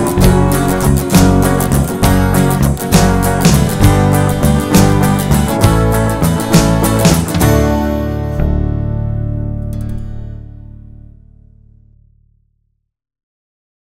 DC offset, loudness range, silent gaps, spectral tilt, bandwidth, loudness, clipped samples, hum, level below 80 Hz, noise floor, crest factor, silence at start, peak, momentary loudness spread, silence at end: under 0.1%; 13 LU; none; -6 dB/octave; 16.5 kHz; -12 LUFS; under 0.1%; none; -20 dBFS; -64 dBFS; 12 dB; 0 s; 0 dBFS; 10 LU; 3.35 s